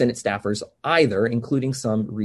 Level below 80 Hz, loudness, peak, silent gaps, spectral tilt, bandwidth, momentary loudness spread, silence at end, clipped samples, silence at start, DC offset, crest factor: -56 dBFS; -22 LUFS; -4 dBFS; none; -5.5 dB/octave; 12.5 kHz; 8 LU; 0 s; under 0.1%; 0 s; under 0.1%; 18 dB